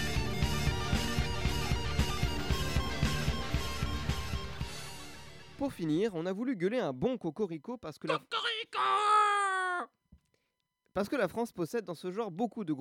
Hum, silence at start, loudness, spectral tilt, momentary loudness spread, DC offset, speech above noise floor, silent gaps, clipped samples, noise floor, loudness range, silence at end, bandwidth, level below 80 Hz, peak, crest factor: none; 0 s; -33 LUFS; -5 dB/octave; 11 LU; under 0.1%; 50 dB; none; under 0.1%; -82 dBFS; 5 LU; 0 s; 16.5 kHz; -42 dBFS; -16 dBFS; 16 dB